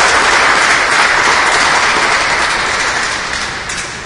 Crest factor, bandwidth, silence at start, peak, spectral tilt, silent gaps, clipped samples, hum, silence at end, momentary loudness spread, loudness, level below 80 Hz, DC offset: 12 dB; 12 kHz; 0 s; 0 dBFS; -0.5 dB/octave; none; under 0.1%; none; 0 s; 9 LU; -10 LUFS; -38 dBFS; under 0.1%